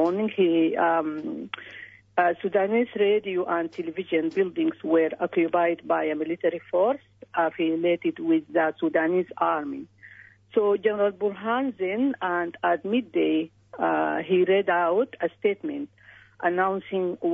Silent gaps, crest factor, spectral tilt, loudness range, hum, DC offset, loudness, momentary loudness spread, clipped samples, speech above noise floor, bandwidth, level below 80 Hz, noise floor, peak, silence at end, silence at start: none; 16 dB; -8 dB/octave; 2 LU; none; under 0.1%; -25 LUFS; 9 LU; under 0.1%; 26 dB; 5.4 kHz; -72 dBFS; -50 dBFS; -8 dBFS; 0 s; 0 s